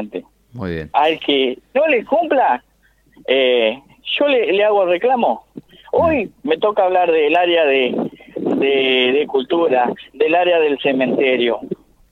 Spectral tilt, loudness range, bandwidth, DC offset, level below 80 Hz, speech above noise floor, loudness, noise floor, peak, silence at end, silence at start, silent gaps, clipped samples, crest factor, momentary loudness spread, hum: -6.5 dB/octave; 2 LU; 5.6 kHz; under 0.1%; -52 dBFS; 38 dB; -16 LUFS; -53 dBFS; -2 dBFS; 0.35 s; 0 s; none; under 0.1%; 14 dB; 11 LU; none